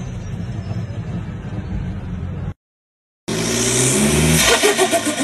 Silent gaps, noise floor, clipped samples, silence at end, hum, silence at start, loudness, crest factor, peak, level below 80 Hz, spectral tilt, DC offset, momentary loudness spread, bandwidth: 2.56-3.27 s; under -90 dBFS; under 0.1%; 0 s; none; 0 s; -18 LUFS; 18 dB; 0 dBFS; -34 dBFS; -3.5 dB/octave; under 0.1%; 15 LU; 13.5 kHz